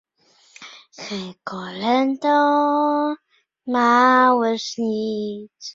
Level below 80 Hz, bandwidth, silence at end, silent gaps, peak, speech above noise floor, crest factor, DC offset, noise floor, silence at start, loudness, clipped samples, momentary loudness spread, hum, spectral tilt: -68 dBFS; 7.6 kHz; 0.05 s; none; -2 dBFS; 38 dB; 18 dB; under 0.1%; -58 dBFS; 0.6 s; -19 LUFS; under 0.1%; 20 LU; none; -4.5 dB/octave